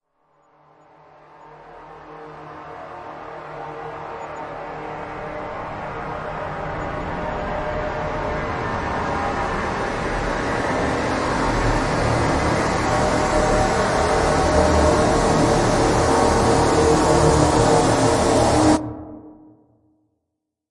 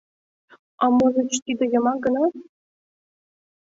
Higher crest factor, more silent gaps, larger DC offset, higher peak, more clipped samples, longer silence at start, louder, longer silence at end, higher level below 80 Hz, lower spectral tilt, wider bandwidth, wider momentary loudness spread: about the same, 18 dB vs 16 dB; second, none vs 1.42-1.46 s; neither; first, -2 dBFS vs -8 dBFS; neither; first, 1.45 s vs 0.8 s; about the same, -20 LUFS vs -21 LUFS; first, 1.35 s vs 1.2 s; first, -34 dBFS vs -62 dBFS; about the same, -5 dB/octave vs -4 dB/octave; first, 11.5 kHz vs 8 kHz; first, 18 LU vs 6 LU